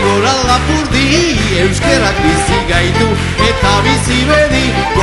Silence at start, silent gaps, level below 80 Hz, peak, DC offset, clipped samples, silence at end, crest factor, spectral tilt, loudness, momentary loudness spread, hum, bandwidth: 0 s; none; -22 dBFS; 0 dBFS; under 0.1%; 0.1%; 0 s; 10 dB; -4.5 dB/octave; -11 LUFS; 3 LU; none; 12 kHz